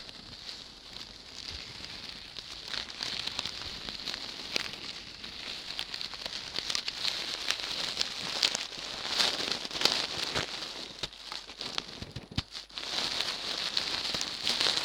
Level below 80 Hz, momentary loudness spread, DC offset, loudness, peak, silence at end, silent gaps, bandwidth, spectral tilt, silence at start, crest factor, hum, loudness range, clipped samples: -60 dBFS; 14 LU; under 0.1%; -33 LUFS; -4 dBFS; 0 s; none; 18 kHz; -1 dB/octave; 0 s; 32 dB; none; 7 LU; under 0.1%